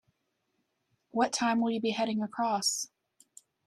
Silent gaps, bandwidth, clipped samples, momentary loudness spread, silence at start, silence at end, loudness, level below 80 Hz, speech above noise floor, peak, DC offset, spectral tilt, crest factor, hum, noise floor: none; 13.5 kHz; under 0.1%; 7 LU; 1.15 s; 0.8 s; -30 LUFS; -78 dBFS; 49 dB; -14 dBFS; under 0.1%; -3 dB/octave; 20 dB; none; -79 dBFS